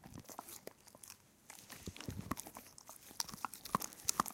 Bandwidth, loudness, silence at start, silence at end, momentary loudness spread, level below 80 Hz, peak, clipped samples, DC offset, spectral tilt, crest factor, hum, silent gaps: 17 kHz; -44 LUFS; 0 s; 0 s; 18 LU; -66 dBFS; -10 dBFS; under 0.1%; under 0.1%; -2.5 dB/octave; 36 dB; none; none